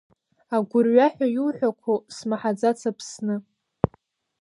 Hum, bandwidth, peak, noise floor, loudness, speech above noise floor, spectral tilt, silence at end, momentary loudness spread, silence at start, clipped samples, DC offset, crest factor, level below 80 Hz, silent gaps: none; 11.5 kHz; -2 dBFS; -62 dBFS; -24 LUFS; 39 dB; -6.5 dB/octave; 1 s; 11 LU; 0.5 s; under 0.1%; under 0.1%; 22 dB; -54 dBFS; none